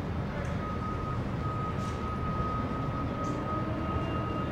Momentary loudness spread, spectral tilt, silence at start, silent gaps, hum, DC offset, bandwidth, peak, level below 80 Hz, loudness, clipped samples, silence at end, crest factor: 2 LU; -7.5 dB/octave; 0 s; none; none; under 0.1%; 11 kHz; -18 dBFS; -42 dBFS; -33 LUFS; under 0.1%; 0 s; 14 dB